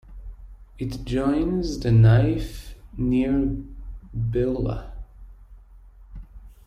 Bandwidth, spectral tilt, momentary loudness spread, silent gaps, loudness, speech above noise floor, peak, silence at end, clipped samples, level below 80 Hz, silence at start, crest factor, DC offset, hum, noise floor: 9.2 kHz; -8.5 dB/octave; 25 LU; none; -23 LUFS; 26 dB; -8 dBFS; 0.15 s; under 0.1%; -36 dBFS; 0.05 s; 16 dB; under 0.1%; none; -47 dBFS